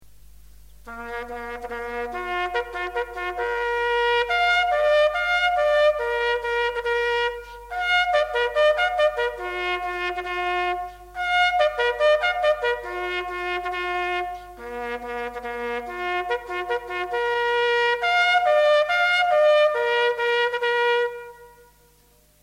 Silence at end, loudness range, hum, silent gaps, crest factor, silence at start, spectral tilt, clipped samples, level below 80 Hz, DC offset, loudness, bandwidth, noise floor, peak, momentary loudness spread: 0.95 s; 9 LU; 50 Hz at -50 dBFS; none; 14 dB; 0.85 s; -2.5 dB/octave; under 0.1%; -50 dBFS; under 0.1%; -22 LUFS; 15.5 kHz; -57 dBFS; -10 dBFS; 12 LU